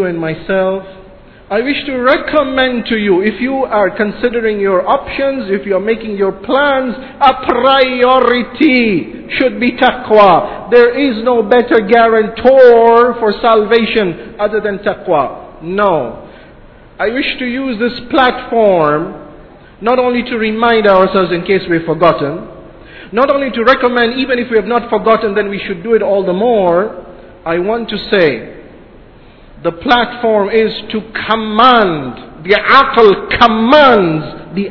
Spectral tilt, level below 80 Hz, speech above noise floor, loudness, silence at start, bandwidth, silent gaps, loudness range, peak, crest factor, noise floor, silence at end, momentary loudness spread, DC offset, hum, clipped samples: -7.5 dB/octave; -40 dBFS; 27 dB; -11 LUFS; 0 s; 5.4 kHz; none; 6 LU; 0 dBFS; 12 dB; -38 dBFS; 0 s; 12 LU; under 0.1%; none; 0.8%